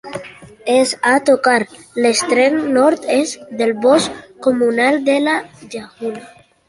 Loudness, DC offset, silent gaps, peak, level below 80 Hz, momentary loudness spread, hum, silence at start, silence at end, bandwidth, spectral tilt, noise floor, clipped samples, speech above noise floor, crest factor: -15 LUFS; under 0.1%; none; -2 dBFS; -60 dBFS; 14 LU; none; 0.05 s; 0.4 s; 11.5 kHz; -3 dB/octave; -36 dBFS; under 0.1%; 21 dB; 14 dB